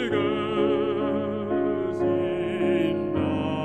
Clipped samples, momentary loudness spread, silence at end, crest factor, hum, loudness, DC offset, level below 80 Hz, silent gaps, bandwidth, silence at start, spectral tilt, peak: under 0.1%; 3 LU; 0 s; 14 dB; none; -25 LUFS; 0.2%; -56 dBFS; none; 8.6 kHz; 0 s; -8 dB/octave; -12 dBFS